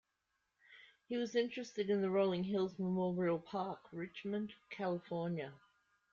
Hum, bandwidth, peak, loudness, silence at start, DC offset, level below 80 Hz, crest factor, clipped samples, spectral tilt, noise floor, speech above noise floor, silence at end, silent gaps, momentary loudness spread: none; 7.2 kHz; -22 dBFS; -39 LUFS; 0.7 s; under 0.1%; -78 dBFS; 18 dB; under 0.1%; -7 dB/octave; -85 dBFS; 47 dB; 0.55 s; none; 10 LU